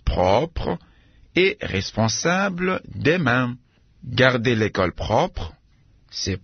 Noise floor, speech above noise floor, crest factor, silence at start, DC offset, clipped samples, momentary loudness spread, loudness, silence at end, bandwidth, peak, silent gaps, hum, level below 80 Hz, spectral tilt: -56 dBFS; 35 dB; 20 dB; 0.05 s; under 0.1%; under 0.1%; 13 LU; -21 LUFS; 0.05 s; 6.6 kHz; -2 dBFS; none; none; -38 dBFS; -5 dB/octave